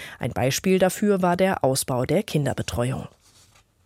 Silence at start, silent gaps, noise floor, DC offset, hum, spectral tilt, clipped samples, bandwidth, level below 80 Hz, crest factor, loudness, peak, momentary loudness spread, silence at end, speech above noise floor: 0 s; none; -57 dBFS; under 0.1%; none; -5 dB/octave; under 0.1%; 16.5 kHz; -50 dBFS; 16 dB; -23 LUFS; -8 dBFS; 8 LU; 0.8 s; 34 dB